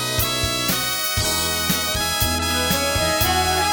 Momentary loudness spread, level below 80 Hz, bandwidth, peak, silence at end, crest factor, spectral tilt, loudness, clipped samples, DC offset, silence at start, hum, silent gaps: 2 LU; -34 dBFS; over 20 kHz; -4 dBFS; 0 s; 16 dB; -2.5 dB/octave; -19 LUFS; under 0.1%; under 0.1%; 0 s; none; none